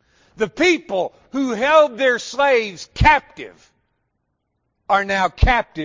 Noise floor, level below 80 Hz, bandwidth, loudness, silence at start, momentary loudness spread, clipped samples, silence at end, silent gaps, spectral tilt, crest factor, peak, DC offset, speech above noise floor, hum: -72 dBFS; -30 dBFS; 7.6 kHz; -18 LUFS; 0.4 s; 11 LU; under 0.1%; 0 s; none; -5 dB/octave; 18 dB; -2 dBFS; under 0.1%; 55 dB; none